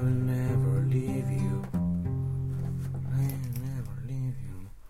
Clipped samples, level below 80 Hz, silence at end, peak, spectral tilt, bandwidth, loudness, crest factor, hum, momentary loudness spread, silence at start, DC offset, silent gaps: under 0.1%; -46 dBFS; 0 s; -16 dBFS; -8.5 dB/octave; 14.5 kHz; -31 LUFS; 12 dB; none; 9 LU; 0 s; under 0.1%; none